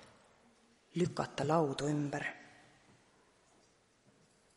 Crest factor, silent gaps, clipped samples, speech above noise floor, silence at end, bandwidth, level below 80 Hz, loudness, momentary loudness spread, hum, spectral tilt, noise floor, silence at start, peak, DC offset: 22 dB; none; under 0.1%; 35 dB; 2.05 s; 11.5 kHz; -72 dBFS; -36 LUFS; 14 LU; none; -6 dB/octave; -70 dBFS; 0 s; -16 dBFS; under 0.1%